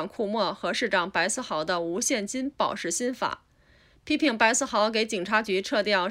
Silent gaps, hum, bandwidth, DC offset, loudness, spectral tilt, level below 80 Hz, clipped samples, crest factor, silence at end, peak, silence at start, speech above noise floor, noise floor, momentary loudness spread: none; none; 16 kHz; under 0.1%; -26 LUFS; -2.5 dB/octave; -62 dBFS; under 0.1%; 20 dB; 0 s; -8 dBFS; 0 s; 33 dB; -59 dBFS; 7 LU